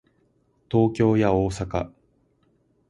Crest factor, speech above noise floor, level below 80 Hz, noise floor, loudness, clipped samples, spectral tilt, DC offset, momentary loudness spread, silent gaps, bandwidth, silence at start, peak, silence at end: 18 dB; 44 dB; -44 dBFS; -65 dBFS; -23 LUFS; under 0.1%; -8 dB/octave; under 0.1%; 10 LU; none; 11.5 kHz; 0.7 s; -6 dBFS; 1 s